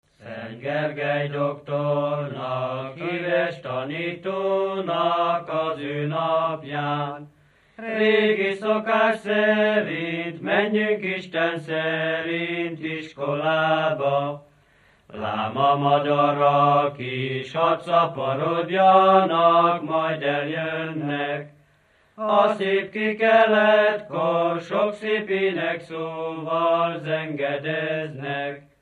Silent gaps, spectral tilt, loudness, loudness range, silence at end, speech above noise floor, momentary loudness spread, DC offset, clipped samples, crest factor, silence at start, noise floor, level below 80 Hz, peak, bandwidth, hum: none; -7 dB/octave; -22 LUFS; 6 LU; 0.2 s; 38 dB; 12 LU; under 0.1%; under 0.1%; 20 dB; 0.2 s; -60 dBFS; -70 dBFS; -4 dBFS; 9.4 kHz; none